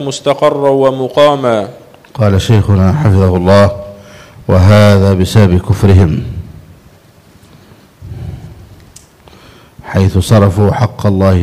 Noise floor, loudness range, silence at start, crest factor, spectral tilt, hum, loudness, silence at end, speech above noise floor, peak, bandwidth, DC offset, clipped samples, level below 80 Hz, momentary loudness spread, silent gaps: -42 dBFS; 9 LU; 0 s; 10 dB; -7 dB/octave; none; -9 LUFS; 0 s; 34 dB; 0 dBFS; 13.5 kHz; under 0.1%; 1%; -32 dBFS; 19 LU; none